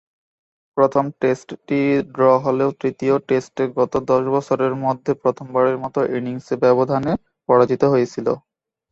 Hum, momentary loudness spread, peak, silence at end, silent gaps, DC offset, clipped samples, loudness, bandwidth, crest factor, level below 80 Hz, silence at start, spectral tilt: none; 8 LU; -2 dBFS; 0.55 s; none; under 0.1%; under 0.1%; -19 LUFS; 8 kHz; 16 dB; -58 dBFS; 0.75 s; -7.5 dB/octave